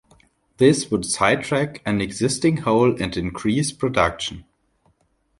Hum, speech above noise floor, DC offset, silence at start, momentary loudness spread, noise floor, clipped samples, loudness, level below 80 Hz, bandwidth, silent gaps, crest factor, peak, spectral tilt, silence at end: none; 45 dB; under 0.1%; 0.6 s; 7 LU; -65 dBFS; under 0.1%; -21 LUFS; -46 dBFS; 11.5 kHz; none; 20 dB; -2 dBFS; -5 dB/octave; 1 s